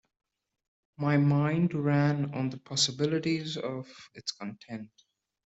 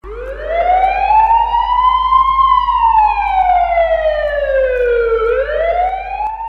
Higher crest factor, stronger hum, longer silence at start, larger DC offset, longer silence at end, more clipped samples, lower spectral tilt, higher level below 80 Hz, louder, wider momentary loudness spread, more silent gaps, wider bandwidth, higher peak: first, 18 dB vs 12 dB; neither; first, 1 s vs 0.05 s; neither; first, 0.65 s vs 0 s; neither; about the same, -5.5 dB/octave vs -5.5 dB/octave; second, -68 dBFS vs -30 dBFS; second, -29 LUFS vs -13 LUFS; first, 16 LU vs 6 LU; neither; first, 8.2 kHz vs 6.2 kHz; second, -12 dBFS vs 0 dBFS